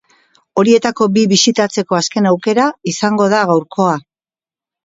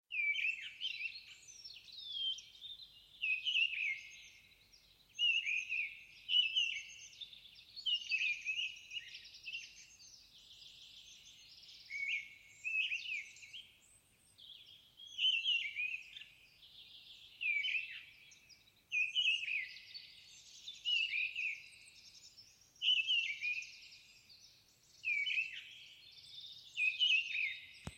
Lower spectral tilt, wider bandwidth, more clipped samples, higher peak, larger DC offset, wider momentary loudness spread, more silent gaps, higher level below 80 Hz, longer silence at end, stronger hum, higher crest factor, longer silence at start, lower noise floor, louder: first, -4.5 dB/octave vs 1.5 dB/octave; second, 8 kHz vs 16.5 kHz; neither; first, 0 dBFS vs -22 dBFS; neither; second, 5 LU vs 24 LU; neither; first, -60 dBFS vs -80 dBFS; first, 0.85 s vs 0 s; neither; second, 14 dB vs 20 dB; first, 0.55 s vs 0.1 s; first, under -90 dBFS vs -69 dBFS; first, -14 LUFS vs -36 LUFS